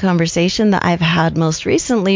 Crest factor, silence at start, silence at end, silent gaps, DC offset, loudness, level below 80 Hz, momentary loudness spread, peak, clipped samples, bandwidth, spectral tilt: 12 dB; 0 s; 0 s; none; under 0.1%; -15 LUFS; -42 dBFS; 2 LU; -2 dBFS; under 0.1%; 7.6 kHz; -5 dB/octave